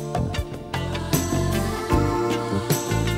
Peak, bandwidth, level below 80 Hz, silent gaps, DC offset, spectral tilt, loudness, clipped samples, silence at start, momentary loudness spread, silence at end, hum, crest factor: -6 dBFS; 16 kHz; -34 dBFS; none; under 0.1%; -5.5 dB/octave; -24 LUFS; under 0.1%; 0 s; 6 LU; 0 s; none; 18 dB